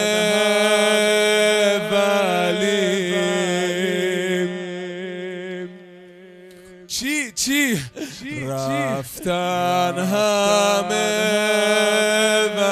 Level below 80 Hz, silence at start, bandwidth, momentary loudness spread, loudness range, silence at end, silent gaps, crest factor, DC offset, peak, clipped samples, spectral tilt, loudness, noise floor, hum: -60 dBFS; 0 s; 14 kHz; 13 LU; 8 LU; 0 s; none; 14 dB; under 0.1%; -6 dBFS; under 0.1%; -3 dB/octave; -19 LUFS; -43 dBFS; none